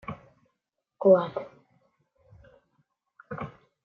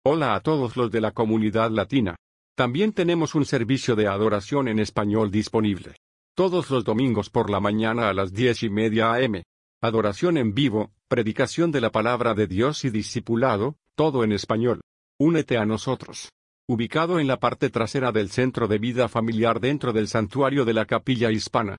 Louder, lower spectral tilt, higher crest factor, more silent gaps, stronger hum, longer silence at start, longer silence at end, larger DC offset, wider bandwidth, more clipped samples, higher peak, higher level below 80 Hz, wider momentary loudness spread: about the same, -25 LUFS vs -23 LUFS; first, -9.5 dB/octave vs -6 dB/octave; first, 22 dB vs 16 dB; second, none vs 2.19-2.55 s, 5.97-6.35 s, 9.46-9.81 s, 14.83-15.19 s, 16.32-16.68 s; neither; about the same, 0.1 s vs 0.05 s; first, 0.35 s vs 0 s; neither; second, 4.5 kHz vs 11 kHz; neither; about the same, -8 dBFS vs -6 dBFS; second, -68 dBFS vs -56 dBFS; first, 23 LU vs 5 LU